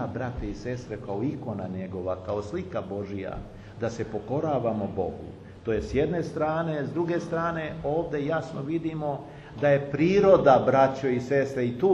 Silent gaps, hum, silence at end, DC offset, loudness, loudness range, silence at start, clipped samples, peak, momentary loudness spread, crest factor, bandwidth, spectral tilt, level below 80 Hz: none; none; 0 s; under 0.1%; -27 LUFS; 10 LU; 0 s; under 0.1%; -4 dBFS; 14 LU; 22 dB; 8.6 kHz; -7.5 dB/octave; -48 dBFS